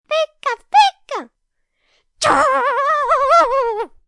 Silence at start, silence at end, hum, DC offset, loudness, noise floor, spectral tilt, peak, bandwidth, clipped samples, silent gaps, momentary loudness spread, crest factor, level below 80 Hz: 0.1 s; 0.2 s; none; under 0.1%; -15 LUFS; -70 dBFS; -2 dB/octave; -2 dBFS; 11.5 kHz; under 0.1%; none; 12 LU; 14 dB; -52 dBFS